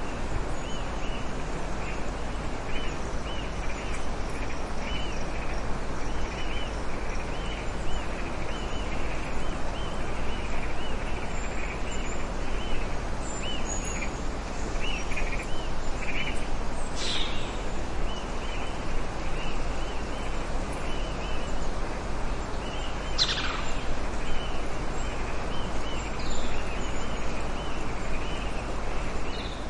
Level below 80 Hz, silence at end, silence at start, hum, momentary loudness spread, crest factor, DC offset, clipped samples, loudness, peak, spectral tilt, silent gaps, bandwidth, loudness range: -32 dBFS; 0 s; 0 s; none; 3 LU; 16 dB; under 0.1%; under 0.1%; -33 LUFS; -10 dBFS; -4 dB/octave; none; 10.5 kHz; 3 LU